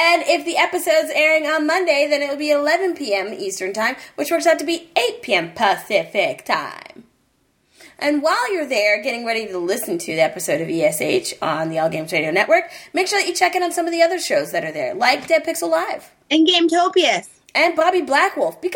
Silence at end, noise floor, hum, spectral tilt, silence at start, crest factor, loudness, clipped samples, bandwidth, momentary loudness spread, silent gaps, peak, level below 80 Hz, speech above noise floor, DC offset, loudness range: 0 s; -63 dBFS; none; -3 dB/octave; 0 s; 18 dB; -18 LUFS; under 0.1%; 17.5 kHz; 7 LU; none; -2 dBFS; -68 dBFS; 44 dB; under 0.1%; 4 LU